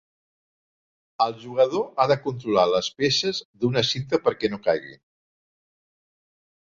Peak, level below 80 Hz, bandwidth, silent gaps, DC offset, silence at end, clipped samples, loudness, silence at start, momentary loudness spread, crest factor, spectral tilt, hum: -4 dBFS; -62 dBFS; 7.6 kHz; 3.45-3.54 s; under 0.1%; 1.7 s; under 0.1%; -23 LUFS; 1.2 s; 4 LU; 20 dB; -4.5 dB/octave; none